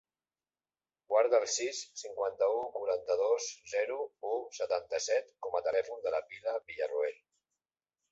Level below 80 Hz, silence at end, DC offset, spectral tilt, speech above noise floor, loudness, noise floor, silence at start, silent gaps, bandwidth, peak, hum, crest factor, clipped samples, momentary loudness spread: -78 dBFS; 1 s; under 0.1%; -0.5 dB/octave; over 57 dB; -34 LUFS; under -90 dBFS; 1.1 s; none; 8 kHz; -16 dBFS; none; 18 dB; under 0.1%; 8 LU